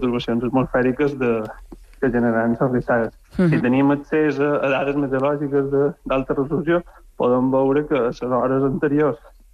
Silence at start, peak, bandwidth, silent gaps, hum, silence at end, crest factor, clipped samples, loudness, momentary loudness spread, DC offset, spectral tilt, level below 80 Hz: 0 s; -8 dBFS; 9 kHz; none; none; 0.35 s; 12 dB; under 0.1%; -20 LUFS; 5 LU; under 0.1%; -8.5 dB/octave; -44 dBFS